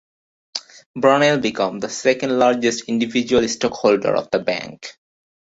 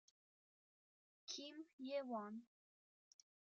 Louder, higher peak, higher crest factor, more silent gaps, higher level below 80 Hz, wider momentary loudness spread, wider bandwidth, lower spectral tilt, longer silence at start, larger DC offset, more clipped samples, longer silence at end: first, -18 LUFS vs -50 LUFS; first, -2 dBFS vs -34 dBFS; about the same, 18 dB vs 20 dB; about the same, 0.86-0.94 s vs 1.73-1.78 s; first, -56 dBFS vs under -90 dBFS; first, 15 LU vs 11 LU; about the same, 8 kHz vs 7.6 kHz; first, -4 dB/octave vs -2.5 dB/octave; second, 0.55 s vs 1.3 s; neither; neither; second, 0.6 s vs 1.1 s